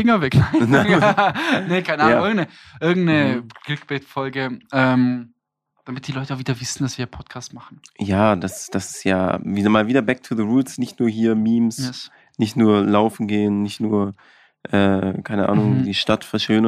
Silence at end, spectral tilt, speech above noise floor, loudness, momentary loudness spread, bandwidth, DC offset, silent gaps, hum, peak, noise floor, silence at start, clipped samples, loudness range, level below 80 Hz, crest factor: 0 s; -6 dB/octave; 51 dB; -19 LUFS; 13 LU; 14 kHz; under 0.1%; none; none; -2 dBFS; -70 dBFS; 0 s; under 0.1%; 6 LU; -50 dBFS; 16 dB